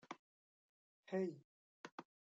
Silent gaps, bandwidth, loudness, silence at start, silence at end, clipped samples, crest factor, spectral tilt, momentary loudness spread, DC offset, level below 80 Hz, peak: 0.19-1.03 s, 1.44-1.84 s, 1.92-1.98 s; 7.8 kHz; -48 LUFS; 0.1 s; 0.35 s; under 0.1%; 20 dB; -7 dB/octave; 17 LU; under 0.1%; under -90 dBFS; -30 dBFS